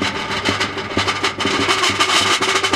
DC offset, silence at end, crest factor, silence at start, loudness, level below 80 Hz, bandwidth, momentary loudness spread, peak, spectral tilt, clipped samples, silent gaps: under 0.1%; 0 s; 16 dB; 0 s; -16 LUFS; -48 dBFS; 16.5 kHz; 6 LU; -2 dBFS; -2 dB/octave; under 0.1%; none